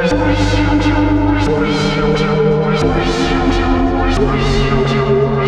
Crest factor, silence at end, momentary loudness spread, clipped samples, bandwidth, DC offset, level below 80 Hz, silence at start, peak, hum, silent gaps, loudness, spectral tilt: 12 dB; 0 s; 1 LU; under 0.1%; 10 kHz; under 0.1%; -22 dBFS; 0 s; -2 dBFS; none; none; -14 LUFS; -6.5 dB/octave